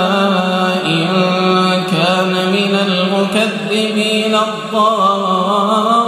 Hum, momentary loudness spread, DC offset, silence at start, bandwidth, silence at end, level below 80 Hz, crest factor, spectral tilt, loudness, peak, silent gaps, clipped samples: none; 3 LU; under 0.1%; 0 s; 14 kHz; 0 s; -62 dBFS; 12 dB; -5 dB/octave; -13 LUFS; -2 dBFS; none; under 0.1%